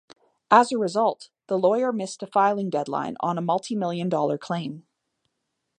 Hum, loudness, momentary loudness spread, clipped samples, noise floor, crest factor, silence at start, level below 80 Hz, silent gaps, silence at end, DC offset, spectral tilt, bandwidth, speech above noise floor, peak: none; -24 LUFS; 12 LU; under 0.1%; -79 dBFS; 22 dB; 0.5 s; -76 dBFS; none; 1 s; under 0.1%; -5.5 dB/octave; 10.5 kHz; 55 dB; -2 dBFS